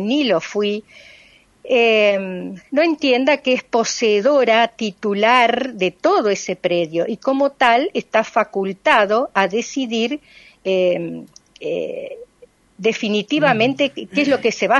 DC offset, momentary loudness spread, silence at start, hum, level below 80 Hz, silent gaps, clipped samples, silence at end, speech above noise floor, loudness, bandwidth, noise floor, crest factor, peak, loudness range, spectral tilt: under 0.1%; 10 LU; 0 s; none; -64 dBFS; none; under 0.1%; 0 s; 33 dB; -18 LUFS; 11 kHz; -51 dBFS; 18 dB; 0 dBFS; 6 LU; -4 dB/octave